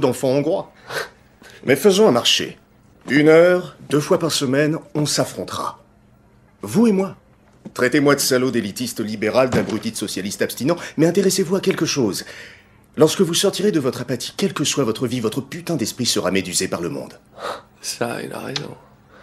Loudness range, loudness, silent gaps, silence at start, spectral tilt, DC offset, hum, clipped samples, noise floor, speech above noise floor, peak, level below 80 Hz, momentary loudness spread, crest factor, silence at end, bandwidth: 6 LU; -19 LUFS; none; 0 s; -4 dB/octave; under 0.1%; none; under 0.1%; -52 dBFS; 33 dB; -2 dBFS; -58 dBFS; 13 LU; 18 dB; 0.45 s; 16 kHz